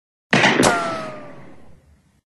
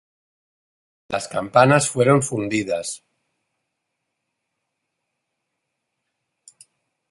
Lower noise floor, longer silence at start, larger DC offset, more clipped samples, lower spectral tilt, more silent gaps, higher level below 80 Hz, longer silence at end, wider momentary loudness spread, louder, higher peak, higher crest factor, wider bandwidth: second, -53 dBFS vs -78 dBFS; second, 0.3 s vs 1.1 s; neither; neither; second, -3.5 dB/octave vs -5 dB/octave; neither; first, -50 dBFS vs -62 dBFS; second, 0.9 s vs 4.15 s; first, 19 LU vs 14 LU; about the same, -17 LUFS vs -19 LUFS; about the same, -2 dBFS vs -2 dBFS; about the same, 20 dB vs 22 dB; about the same, 12.5 kHz vs 11.5 kHz